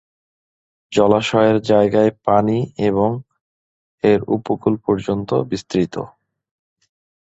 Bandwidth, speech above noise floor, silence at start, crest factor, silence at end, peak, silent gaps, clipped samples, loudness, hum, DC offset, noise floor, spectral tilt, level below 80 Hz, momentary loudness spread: 8 kHz; over 73 dB; 0.9 s; 18 dB; 1.15 s; -2 dBFS; 3.41-3.98 s; under 0.1%; -18 LUFS; none; under 0.1%; under -90 dBFS; -7 dB/octave; -50 dBFS; 7 LU